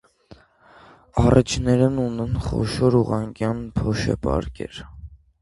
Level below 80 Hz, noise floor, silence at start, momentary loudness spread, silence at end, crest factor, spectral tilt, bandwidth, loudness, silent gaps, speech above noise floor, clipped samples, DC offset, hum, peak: -36 dBFS; -51 dBFS; 0.3 s; 16 LU; 0.25 s; 22 dB; -7 dB/octave; 11.5 kHz; -22 LUFS; none; 31 dB; under 0.1%; under 0.1%; none; 0 dBFS